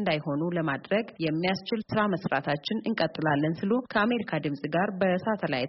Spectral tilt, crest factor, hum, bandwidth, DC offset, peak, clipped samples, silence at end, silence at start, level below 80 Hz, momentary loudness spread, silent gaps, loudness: -4.5 dB/octave; 18 dB; none; 5.8 kHz; under 0.1%; -10 dBFS; under 0.1%; 0 s; 0 s; -64 dBFS; 4 LU; none; -28 LUFS